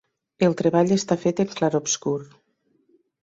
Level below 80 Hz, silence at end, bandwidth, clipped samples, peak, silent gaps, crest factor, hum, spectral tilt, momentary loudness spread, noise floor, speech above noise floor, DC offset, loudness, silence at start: -62 dBFS; 1 s; 8 kHz; under 0.1%; -6 dBFS; none; 18 dB; none; -5 dB/octave; 5 LU; -67 dBFS; 45 dB; under 0.1%; -22 LUFS; 0.4 s